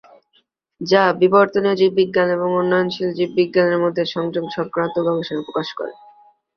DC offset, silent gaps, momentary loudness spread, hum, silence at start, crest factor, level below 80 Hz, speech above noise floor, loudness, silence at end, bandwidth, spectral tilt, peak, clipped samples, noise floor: under 0.1%; none; 10 LU; none; 0.8 s; 18 dB; -62 dBFS; 45 dB; -18 LUFS; 0.65 s; 6.6 kHz; -6.5 dB/octave; -2 dBFS; under 0.1%; -63 dBFS